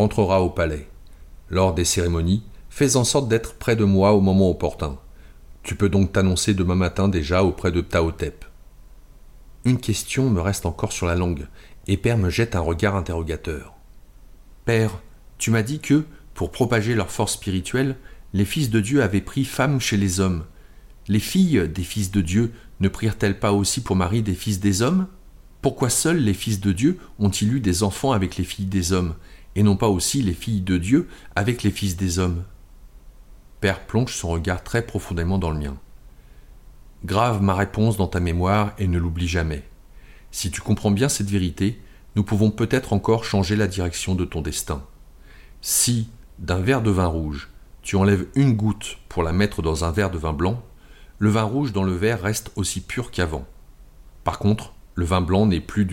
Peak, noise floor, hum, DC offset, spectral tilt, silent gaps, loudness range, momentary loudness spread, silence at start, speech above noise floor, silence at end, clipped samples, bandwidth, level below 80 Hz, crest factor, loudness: -6 dBFS; -45 dBFS; none; under 0.1%; -5.5 dB/octave; none; 5 LU; 10 LU; 0 s; 24 dB; 0 s; under 0.1%; 16.5 kHz; -38 dBFS; 16 dB; -22 LUFS